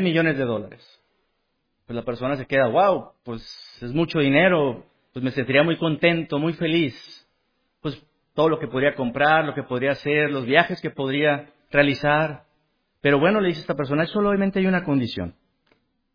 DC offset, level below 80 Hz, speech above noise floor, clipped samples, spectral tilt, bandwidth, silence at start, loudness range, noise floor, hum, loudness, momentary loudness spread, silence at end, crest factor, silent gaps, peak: under 0.1%; -54 dBFS; 51 dB; under 0.1%; -8 dB/octave; 5.2 kHz; 0 s; 3 LU; -73 dBFS; none; -22 LUFS; 16 LU; 0.85 s; 22 dB; none; -2 dBFS